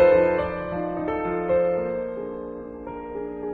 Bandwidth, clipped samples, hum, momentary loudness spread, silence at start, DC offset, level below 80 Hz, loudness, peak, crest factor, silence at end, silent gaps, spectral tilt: 4.6 kHz; under 0.1%; none; 14 LU; 0 s; under 0.1%; -48 dBFS; -25 LUFS; -6 dBFS; 18 dB; 0 s; none; -9.5 dB/octave